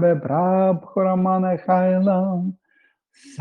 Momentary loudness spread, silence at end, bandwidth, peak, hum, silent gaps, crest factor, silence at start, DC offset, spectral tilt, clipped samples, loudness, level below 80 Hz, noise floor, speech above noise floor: 7 LU; 0.1 s; 6.4 kHz; -6 dBFS; none; none; 14 dB; 0 s; under 0.1%; -10 dB/octave; under 0.1%; -20 LUFS; -66 dBFS; -63 dBFS; 44 dB